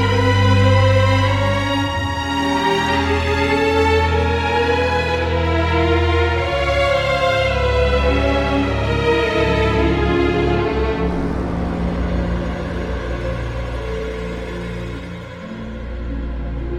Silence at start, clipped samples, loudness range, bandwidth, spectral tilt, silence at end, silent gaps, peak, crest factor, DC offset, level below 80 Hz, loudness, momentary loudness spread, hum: 0 s; under 0.1%; 9 LU; 12 kHz; -6.5 dB/octave; 0 s; none; -2 dBFS; 14 dB; under 0.1%; -26 dBFS; -18 LUFS; 12 LU; none